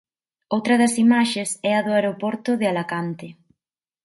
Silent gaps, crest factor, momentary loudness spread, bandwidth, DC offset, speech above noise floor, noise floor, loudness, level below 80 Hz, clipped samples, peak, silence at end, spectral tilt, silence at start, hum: none; 18 dB; 11 LU; 11.5 kHz; under 0.1%; 67 dB; -87 dBFS; -21 LUFS; -70 dBFS; under 0.1%; -4 dBFS; 0.75 s; -4.5 dB/octave; 0.5 s; none